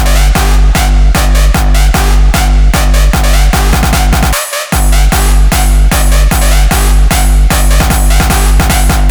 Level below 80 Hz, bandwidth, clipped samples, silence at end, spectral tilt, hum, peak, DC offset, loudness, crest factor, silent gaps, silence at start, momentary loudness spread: -6 dBFS; over 20 kHz; under 0.1%; 0 s; -4 dB/octave; none; 0 dBFS; under 0.1%; -9 LUFS; 6 dB; none; 0 s; 1 LU